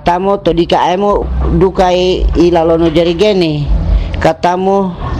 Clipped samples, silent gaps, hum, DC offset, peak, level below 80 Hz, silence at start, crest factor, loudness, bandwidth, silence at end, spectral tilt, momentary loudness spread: under 0.1%; none; none; under 0.1%; -2 dBFS; -18 dBFS; 0 s; 10 dB; -11 LUFS; 9.4 kHz; 0 s; -7 dB/octave; 4 LU